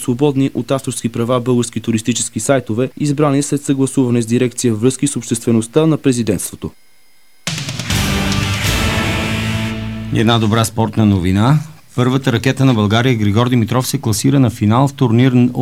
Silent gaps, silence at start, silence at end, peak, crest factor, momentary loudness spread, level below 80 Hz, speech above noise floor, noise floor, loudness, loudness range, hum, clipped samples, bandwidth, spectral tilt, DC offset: none; 0 s; 0 s; 0 dBFS; 14 dB; 7 LU; -34 dBFS; 39 dB; -53 dBFS; -15 LUFS; 4 LU; none; under 0.1%; 16.5 kHz; -5.5 dB/octave; 0.7%